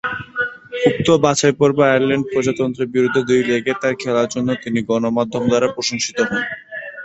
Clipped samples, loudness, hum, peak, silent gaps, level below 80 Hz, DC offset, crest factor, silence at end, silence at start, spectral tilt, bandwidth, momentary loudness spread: under 0.1%; -18 LUFS; none; 0 dBFS; none; -52 dBFS; under 0.1%; 18 dB; 0 s; 0.05 s; -4.5 dB/octave; 8.2 kHz; 9 LU